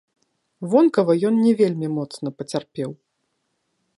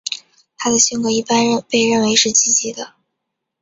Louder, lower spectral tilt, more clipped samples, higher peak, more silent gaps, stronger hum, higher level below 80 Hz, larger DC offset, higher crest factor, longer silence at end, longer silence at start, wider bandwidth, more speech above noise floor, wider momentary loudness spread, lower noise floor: second, -20 LUFS vs -14 LUFS; first, -7.5 dB/octave vs -1.5 dB/octave; neither; second, -4 dBFS vs 0 dBFS; neither; neither; second, -72 dBFS vs -58 dBFS; neither; about the same, 18 dB vs 18 dB; first, 1.05 s vs 0.75 s; first, 0.6 s vs 0.05 s; first, 11.5 kHz vs 7.8 kHz; second, 54 dB vs 61 dB; about the same, 14 LU vs 15 LU; second, -73 dBFS vs -77 dBFS